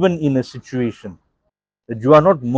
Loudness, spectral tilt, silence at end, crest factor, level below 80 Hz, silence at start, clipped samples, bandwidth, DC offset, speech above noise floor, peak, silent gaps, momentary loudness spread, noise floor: -16 LUFS; -8 dB/octave; 0 s; 18 dB; -54 dBFS; 0 s; under 0.1%; 7.8 kHz; under 0.1%; 57 dB; 0 dBFS; none; 22 LU; -73 dBFS